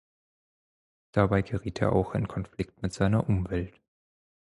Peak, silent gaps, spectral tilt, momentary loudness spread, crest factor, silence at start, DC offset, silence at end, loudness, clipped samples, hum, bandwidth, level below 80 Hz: -8 dBFS; none; -8 dB/octave; 9 LU; 22 dB; 1.15 s; under 0.1%; 0.85 s; -29 LUFS; under 0.1%; none; 11.5 kHz; -46 dBFS